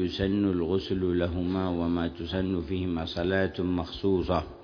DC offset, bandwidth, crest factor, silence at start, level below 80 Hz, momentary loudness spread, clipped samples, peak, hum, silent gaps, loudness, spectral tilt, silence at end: under 0.1%; 5.4 kHz; 16 dB; 0 s; -46 dBFS; 4 LU; under 0.1%; -10 dBFS; none; none; -29 LUFS; -8 dB/octave; 0 s